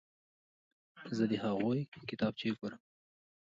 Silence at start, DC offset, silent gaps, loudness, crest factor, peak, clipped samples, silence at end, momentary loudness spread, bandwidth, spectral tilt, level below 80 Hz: 0.95 s; under 0.1%; 1.88-1.92 s; -37 LUFS; 18 dB; -20 dBFS; under 0.1%; 0.65 s; 10 LU; 7.6 kHz; -7 dB/octave; -74 dBFS